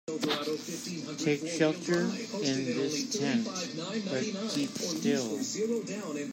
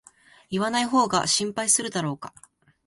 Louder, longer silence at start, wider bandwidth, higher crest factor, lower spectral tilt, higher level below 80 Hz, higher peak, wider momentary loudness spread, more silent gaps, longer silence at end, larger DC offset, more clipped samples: second, -32 LUFS vs -23 LUFS; second, 0.05 s vs 0.5 s; first, 16 kHz vs 12 kHz; about the same, 20 dB vs 20 dB; first, -4 dB/octave vs -2.5 dB/octave; second, -78 dBFS vs -62 dBFS; second, -12 dBFS vs -6 dBFS; second, 6 LU vs 11 LU; neither; second, 0 s vs 0.6 s; neither; neither